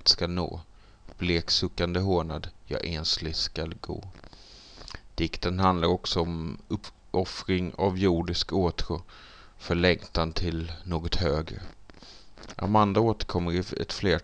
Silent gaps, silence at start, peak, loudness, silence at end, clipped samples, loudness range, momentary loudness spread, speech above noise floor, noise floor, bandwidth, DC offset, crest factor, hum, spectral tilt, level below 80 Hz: none; 0 s; -8 dBFS; -28 LUFS; 0 s; under 0.1%; 3 LU; 17 LU; 22 dB; -50 dBFS; 9.4 kHz; under 0.1%; 22 dB; none; -5.5 dB/octave; -40 dBFS